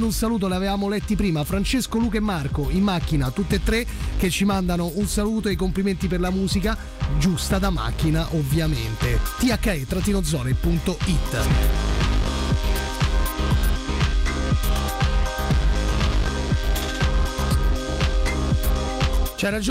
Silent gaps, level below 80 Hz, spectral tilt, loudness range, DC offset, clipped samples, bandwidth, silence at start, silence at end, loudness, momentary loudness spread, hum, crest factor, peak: none; -24 dBFS; -5.5 dB/octave; 1 LU; under 0.1%; under 0.1%; 16 kHz; 0 s; 0 s; -23 LUFS; 3 LU; none; 8 dB; -12 dBFS